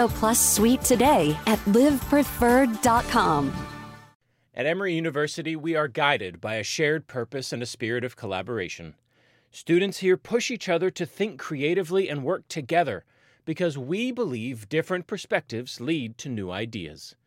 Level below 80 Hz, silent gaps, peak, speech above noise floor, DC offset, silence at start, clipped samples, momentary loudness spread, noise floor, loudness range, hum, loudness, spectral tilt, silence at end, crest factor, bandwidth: -48 dBFS; 4.15-4.20 s; -6 dBFS; 39 dB; under 0.1%; 0 s; under 0.1%; 13 LU; -64 dBFS; 8 LU; none; -25 LUFS; -4 dB/octave; 0.15 s; 20 dB; 16.5 kHz